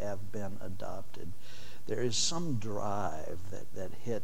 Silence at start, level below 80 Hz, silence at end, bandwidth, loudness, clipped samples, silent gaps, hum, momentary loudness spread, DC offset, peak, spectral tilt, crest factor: 0 s; -60 dBFS; 0 s; 16.5 kHz; -37 LUFS; under 0.1%; none; none; 18 LU; 4%; -18 dBFS; -4 dB/octave; 18 dB